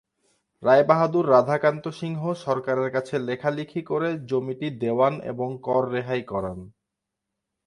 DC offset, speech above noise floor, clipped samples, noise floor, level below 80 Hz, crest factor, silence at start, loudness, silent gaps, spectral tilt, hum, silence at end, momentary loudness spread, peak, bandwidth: under 0.1%; 60 dB; under 0.1%; -84 dBFS; -60 dBFS; 22 dB; 0.6 s; -24 LUFS; none; -7.5 dB/octave; none; 0.95 s; 12 LU; -4 dBFS; 11 kHz